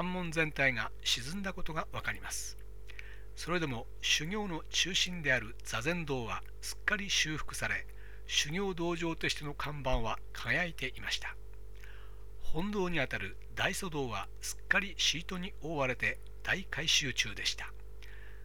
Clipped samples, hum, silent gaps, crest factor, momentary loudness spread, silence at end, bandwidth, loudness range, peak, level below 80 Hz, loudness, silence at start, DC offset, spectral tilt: under 0.1%; 50 Hz at -50 dBFS; none; 24 dB; 20 LU; 0 s; 18.5 kHz; 5 LU; -10 dBFS; -48 dBFS; -34 LUFS; 0 s; 0.7%; -2.5 dB/octave